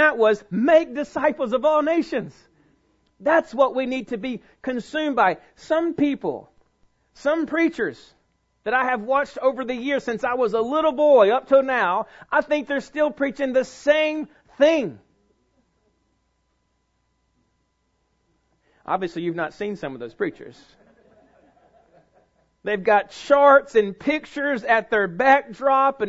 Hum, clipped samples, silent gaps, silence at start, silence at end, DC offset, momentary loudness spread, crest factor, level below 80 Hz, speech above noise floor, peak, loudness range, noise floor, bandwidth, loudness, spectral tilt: none; under 0.1%; none; 0 s; 0 s; under 0.1%; 13 LU; 20 dB; -60 dBFS; 49 dB; -2 dBFS; 11 LU; -70 dBFS; 8 kHz; -21 LUFS; -5.5 dB/octave